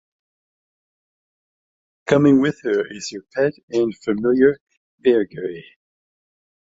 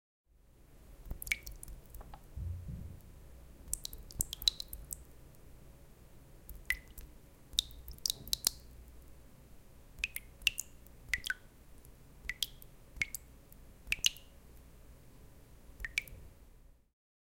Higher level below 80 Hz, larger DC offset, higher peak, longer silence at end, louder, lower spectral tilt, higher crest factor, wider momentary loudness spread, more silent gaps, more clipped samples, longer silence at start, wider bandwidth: second, -60 dBFS vs -54 dBFS; neither; first, -2 dBFS vs -6 dBFS; first, 1.15 s vs 0.55 s; first, -19 LUFS vs -37 LUFS; first, -6.5 dB/octave vs -0.5 dB/octave; second, 20 dB vs 38 dB; second, 15 LU vs 26 LU; first, 3.63-3.68 s, 4.61-4.67 s, 4.77-4.98 s vs none; neither; first, 2.05 s vs 0.35 s; second, 7.8 kHz vs 17 kHz